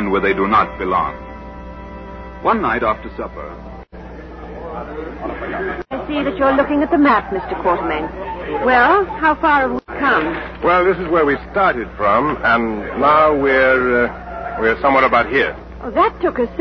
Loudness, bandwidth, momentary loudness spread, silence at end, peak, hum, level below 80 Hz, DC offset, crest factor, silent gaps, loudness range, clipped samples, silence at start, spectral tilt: -16 LUFS; 6.2 kHz; 20 LU; 0 s; -2 dBFS; none; -36 dBFS; under 0.1%; 16 dB; none; 8 LU; under 0.1%; 0 s; -7.5 dB/octave